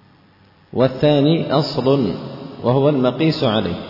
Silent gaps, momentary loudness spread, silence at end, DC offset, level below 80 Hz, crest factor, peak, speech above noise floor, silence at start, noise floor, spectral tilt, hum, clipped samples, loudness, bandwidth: none; 8 LU; 0 s; under 0.1%; -52 dBFS; 14 dB; -4 dBFS; 35 dB; 0.75 s; -51 dBFS; -8.5 dB/octave; none; under 0.1%; -17 LUFS; 5.8 kHz